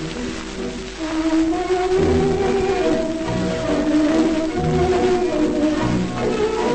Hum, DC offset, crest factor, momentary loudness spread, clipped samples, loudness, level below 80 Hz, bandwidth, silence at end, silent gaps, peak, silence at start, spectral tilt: none; under 0.1%; 14 dB; 10 LU; under 0.1%; -20 LUFS; -36 dBFS; 8.8 kHz; 0 s; none; -6 dBFS; 0 s; -6 dB/octave